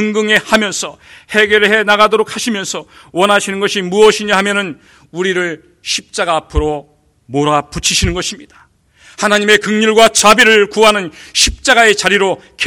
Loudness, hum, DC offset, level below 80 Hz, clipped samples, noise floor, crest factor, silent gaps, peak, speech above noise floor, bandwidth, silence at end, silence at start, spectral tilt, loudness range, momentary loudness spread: -11 LUFS; none; under 0.1%; -32 dBFS; 0.9%; -45 dBFS; 12 dB; none; 0 dBFS; 33 dB; over 20 kHz; 0 s; 0 s; -2.5 dB/octave; 8 LU; 13 LU